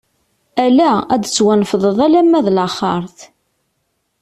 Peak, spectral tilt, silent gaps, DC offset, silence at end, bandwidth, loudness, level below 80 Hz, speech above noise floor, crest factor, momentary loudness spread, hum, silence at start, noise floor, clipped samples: -2 dBFS; -5 dB/octave; none; under 0.1%; 0.95 s; 13 kHz; -14 LUFS; -54 dBFS; 55 dB; 12 dB; 9 LU; none; 0.55 s; -68 dBFS; under 0.1%